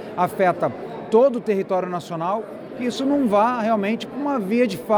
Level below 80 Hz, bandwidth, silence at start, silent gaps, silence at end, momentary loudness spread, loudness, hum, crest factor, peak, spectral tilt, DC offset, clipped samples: -62 dBFS; over 20 kHz; 0 s; none; 0 s; 10 LU; -21 LUFS; none; 14 dB; -6 dBFS; -6.5 dB/octave; under 0.1%; under 0.1%